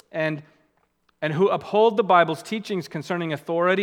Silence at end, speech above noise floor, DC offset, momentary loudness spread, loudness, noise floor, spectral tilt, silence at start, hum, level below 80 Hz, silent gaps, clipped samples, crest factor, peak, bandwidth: 0 s; 45 dB; under 0.1%; 11 LU; -23 LUFS; -67 dBFS; -6 dB/octave; 0.15 s; none; -72 dBFS; none; under 0.1%; 20 dB; -2 dBFS; 16 kHz